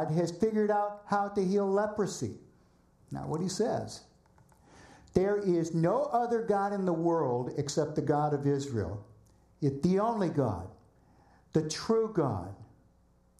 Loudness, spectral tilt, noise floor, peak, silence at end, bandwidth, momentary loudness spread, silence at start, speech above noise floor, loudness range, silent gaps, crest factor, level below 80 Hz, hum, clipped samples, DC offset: -31 LUFS; -6.5 dB/octave; -65 dBFS; -12 dBFS; 0.75 s; 13 kHz; 11 LU; 0 s; 35 dB; 4 LU; none; 20 dB; -60 dBFS; none; under 0.1%; under 0.1%